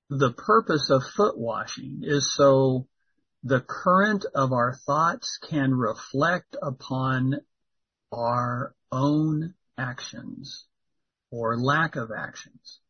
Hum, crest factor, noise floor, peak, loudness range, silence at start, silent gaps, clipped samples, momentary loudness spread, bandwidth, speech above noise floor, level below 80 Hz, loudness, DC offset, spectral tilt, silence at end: none; 18 dB; -82 dBFS; -6 dBFS; 6 LU; 0.1 s; none; under 0.1%; 16 LU; 6.6 kHz; 57 dB; -62 dBFS; -25 LUFS; under 0.1%; -5.5 dB/octave; 0.15 s